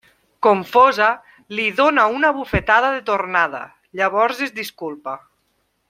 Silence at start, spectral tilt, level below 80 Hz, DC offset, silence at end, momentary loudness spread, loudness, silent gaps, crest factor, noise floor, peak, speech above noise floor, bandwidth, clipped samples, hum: 0.4 s; -5 dB/octave; -44 dBFS; under 0.1%; 0.7 s; 16 LU; -18 LUFS; none; 18 dB; -67 dBFS; -2 dBFS; 49 dB; 16.5 kHz; under 0.1%; none